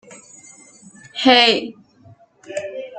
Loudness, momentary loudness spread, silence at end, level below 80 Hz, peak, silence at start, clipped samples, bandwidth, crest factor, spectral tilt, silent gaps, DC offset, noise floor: -15 LUFS; 21 LU; 0 s; -66 dBFS; 0 dBFS; 0.1 s; under 0.1%; 9.2 kHz; 20 dB; -2.5 dB/octave; none; under 0.1%; -49 dBFS